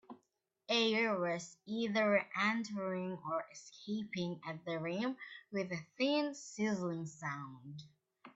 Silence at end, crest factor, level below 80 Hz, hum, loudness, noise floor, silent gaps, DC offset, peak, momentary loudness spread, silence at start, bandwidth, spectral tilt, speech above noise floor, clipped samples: 0.05 s; 20 dB; -82 dBFS; none; -37 LUFS; -81 dBFS; none; under 0.1%; -20 dBFS; 13 LU; 0.1 s; 8.2 kHz; -4.5 dB/octave; 44 dB; under 0.1%